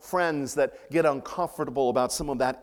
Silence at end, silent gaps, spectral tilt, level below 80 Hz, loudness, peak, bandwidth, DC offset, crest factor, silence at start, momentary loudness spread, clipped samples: 0 s; none; -4.5 dB/octave; -52 dBFS; -27 LUFS; -10 dBFS; 18 kHz; under 0.1%; 18 dB; 0.05 s; 5 LU; under 0.1%